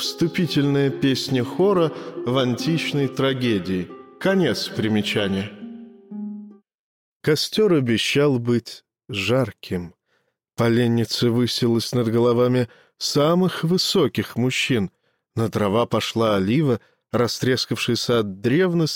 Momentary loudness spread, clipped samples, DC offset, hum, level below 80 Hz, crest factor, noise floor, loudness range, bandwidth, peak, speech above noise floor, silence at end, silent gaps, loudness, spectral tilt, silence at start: 12 LU; under 0.1%; under 0.1%; none; -60 dBFS; 14 dB; -70 dBFS; 4 LU; 17 kHz; -8 dBFS; 49 dB; 0 s; 6.74-7.20 s; -21 LUFS; -5.5 dB/octave; 0 s